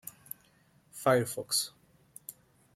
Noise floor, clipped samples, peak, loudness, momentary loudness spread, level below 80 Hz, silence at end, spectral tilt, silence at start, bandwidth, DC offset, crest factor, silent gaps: -66 dBFS; under 0.1%; -14 dBFS; -30 LUFS; 20 LU; -74 dBFS; 0.45 s; -3 dB/octave; 0.05 s; 16.5 kHz; under 0.1%; 22 dB; none